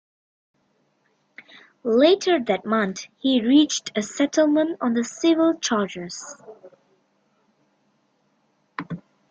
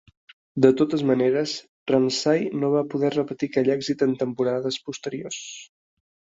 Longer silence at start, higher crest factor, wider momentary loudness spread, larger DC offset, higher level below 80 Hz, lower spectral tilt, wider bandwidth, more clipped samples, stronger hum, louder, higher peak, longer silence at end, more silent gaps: first, 1.85 s vs 0.55 s; about the same, 20 dB vs 22 dB; first, 19 LU vs 12 LU; neither; about the same, -70 dBFS vs -66 dBFS; second, -4 dB/octave vs -5.5 dB/octave; first, 8.8 kHz vs 7.8 kHz; neither; neither; about the same, -21 LUFS vs -23 LUFS; about the same, -4 dBFS vs -2 dBFS; second, 0.3 s vs 0.75 s; second, none vs 1.68-1.86 s